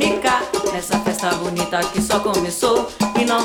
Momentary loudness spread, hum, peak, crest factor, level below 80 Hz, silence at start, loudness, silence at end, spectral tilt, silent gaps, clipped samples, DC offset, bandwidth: 3 LU; none; -4 dBFS; 16 dB; -44 dBFS; 0 s; -19 LUFS; 0 s; -3.5 dB/octave; none; under 0.1%; under 0.1%; 19 kHz